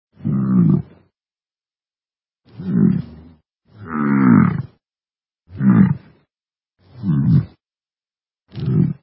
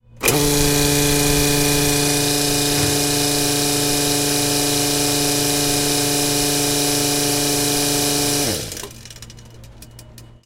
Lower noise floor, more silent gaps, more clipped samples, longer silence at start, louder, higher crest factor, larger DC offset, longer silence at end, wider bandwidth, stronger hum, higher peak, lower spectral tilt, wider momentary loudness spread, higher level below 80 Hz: first, under -90 dBFS vs -41 dBFS; neither; neither; about the same, 0.25 s vs 0.15 s; about the same, -17 LUFS vs -16 LUFS; about the same, 18 dB vs 18 dB; neither; about the same, 0.1 s vs 0.2 s; second, 4.7 kHz vs 16.5 kHz; neither; about the same, 0 dBFS vs 0 dBFS; first, -14 dB/octave vs -2.5 dB/octave; first, 19 LU vs 2 LU; second, -46 dBFS vs -34 dBFS